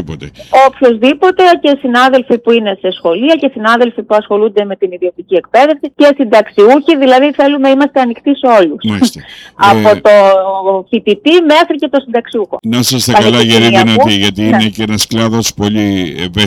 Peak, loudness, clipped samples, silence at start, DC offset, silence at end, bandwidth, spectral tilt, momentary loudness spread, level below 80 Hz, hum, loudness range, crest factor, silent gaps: 0 dBFS; -9 LUFS; 0.2%; 0 s; under 0.1%; 0 s; 18 kHz; -4.5 dB/octave; 8 LU; -46 dBFS; none; 2 LU; 8 dB; none